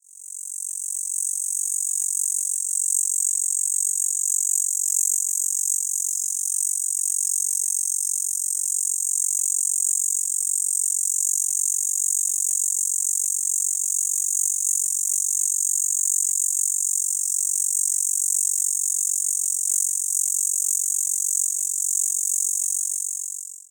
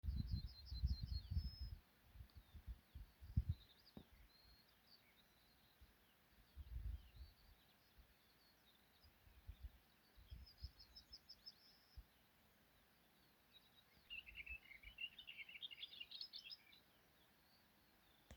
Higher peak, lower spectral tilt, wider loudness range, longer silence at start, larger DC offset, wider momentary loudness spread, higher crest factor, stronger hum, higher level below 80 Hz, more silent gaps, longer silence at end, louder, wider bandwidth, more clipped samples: first, -6 dBFS vs -28 dBFS; second, 11.5 dB/octave vs -5.5 dB/octave; second, 1 LU vs 13 LU; about the same, 0.15 s vs 0.05 s; neither; second, 3 LU vs 20 LU; second, 18 dB vs 26 dB; neither; second, under -90 dBFS vs -58 dBFS; neither; about the same, 0.1 s vs 0 s; first, -20 LUFS vs -54 LUFS; about the same, over 20 kHz vs over 20 kHz; neither